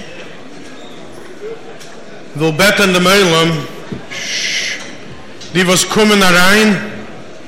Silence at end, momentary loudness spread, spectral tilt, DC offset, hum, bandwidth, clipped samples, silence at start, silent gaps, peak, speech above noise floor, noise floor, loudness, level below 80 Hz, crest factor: 0 s; 25 LU; -3.5 dB/octave; under 0.1%; none; 16.5 kHz; under 0.1%; 0 s; none; -2 dBFS; 22 dB; -33 dBFS; -11 LUFS; -42 dBFS; 14 dB